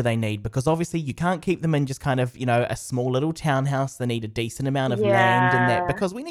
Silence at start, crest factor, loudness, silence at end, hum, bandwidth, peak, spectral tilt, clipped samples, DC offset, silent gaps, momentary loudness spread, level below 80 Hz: 0 s; 16 dB; -23 LUFS; 0 s; none; 14 kHz; -6 dBFS; -6 dB/octave; under 0.1%; under 0.1%; none; 8 LU; -50 dBFS